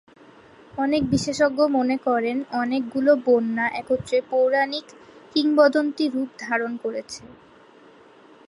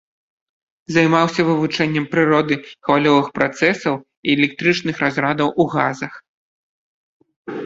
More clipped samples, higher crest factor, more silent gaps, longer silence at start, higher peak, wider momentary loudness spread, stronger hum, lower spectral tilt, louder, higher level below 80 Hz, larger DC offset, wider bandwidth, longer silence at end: neither; about the same, 18 dB vs 18 dB; second, none vs 4.17-4.23 s, 6.28-7.20 s, 7.36-7.45 s; second, 0.75 s vs 0.9 s; second, -6 dBFS vs 0 dBFS; first, 11 LU vs 7 LU; neither; about the same, -5 dB/octave vs -6 dB/octave; second, -22 LUFS vs -18 LUFS; about the same, -56 dBFS vs -58 dBFS; neither; first, 11.5 kHz vs 7.8 kHz; first, 1.15 s vs 0 s